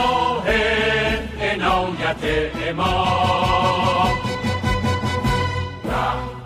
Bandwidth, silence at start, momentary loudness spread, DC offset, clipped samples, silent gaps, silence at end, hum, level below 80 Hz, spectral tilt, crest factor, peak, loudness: 16 kHz; 0 s; 5 LU; under 0.1%; under 0.1%; none; 0 s; none; -34 dBFS; -5.5 dB/octave; 14 dB; -6 dBFS; -20 LUFS